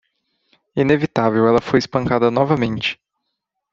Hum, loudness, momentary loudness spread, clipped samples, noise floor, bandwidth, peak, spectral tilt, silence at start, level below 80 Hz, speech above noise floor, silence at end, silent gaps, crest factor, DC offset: none; -18 LUFS; 8 LU; under 0.1%; -77 dBFS; 7.6 kHz; -2 dBFS; -7 dB/octave; 0.75 s; -50 dBFS; 60 dB; 0.8 s; none; 16 dB; under 0.1%